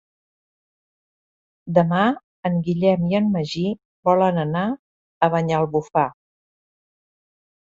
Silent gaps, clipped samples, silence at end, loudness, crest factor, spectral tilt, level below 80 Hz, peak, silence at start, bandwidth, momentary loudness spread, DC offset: 2.24-2.43 s, 3.85-4.03 s, 4.79-5.21 s; under 0.1%; 1.55 s; -21 LUFS; 20 dB; -8 dB/octave; -60 dBFS; -4 dBFS; 1.65 s; 7.6 kHz; 8 LU; under 0.1%